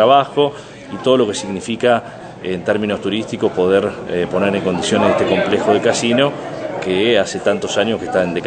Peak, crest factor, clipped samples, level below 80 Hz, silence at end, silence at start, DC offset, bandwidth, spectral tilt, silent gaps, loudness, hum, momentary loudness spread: 0 dBFS; 16 dB; under 0.1%; -54 dBFS; 0 s; 0 s; under 0.1%; 9.4 kHz; -4.5 dB/octave; none; -17 LUFS; none; 9 LU